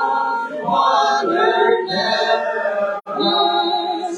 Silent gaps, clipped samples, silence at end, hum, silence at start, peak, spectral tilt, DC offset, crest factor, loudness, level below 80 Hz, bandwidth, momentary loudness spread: none; under 0.1%; 0 s; none; 0 s; -4 dBFS; -3.5 dB/octave; under 0.1%; 14 dB; -17 LUFS; -74 dBFS; 11 kHz; 6 LU